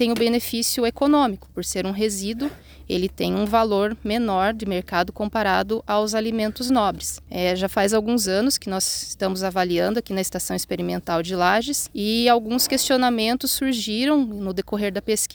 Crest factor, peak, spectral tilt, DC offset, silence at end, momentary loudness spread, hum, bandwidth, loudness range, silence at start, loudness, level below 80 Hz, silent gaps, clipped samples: 18 dB; -4 dBFS; -3.5 dB/octave; under 0.1%; 0 s; 7 LU; none; over 20 kHz; 3 LU; 0 s; -22 LUFS; -48 dBFS; none; under 0.1%